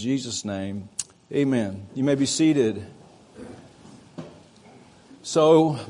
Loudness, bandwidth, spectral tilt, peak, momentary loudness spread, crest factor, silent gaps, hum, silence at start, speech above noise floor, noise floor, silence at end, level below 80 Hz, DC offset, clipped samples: -23 LUFS; 11 kHz; -5 dB/octave; -4 dBFS; 25 LU; 20 dB; none; none; 0 s; 28 dB; -50 dBFS; 0 s; -66 dBFS; under 0.1%; under 0.1%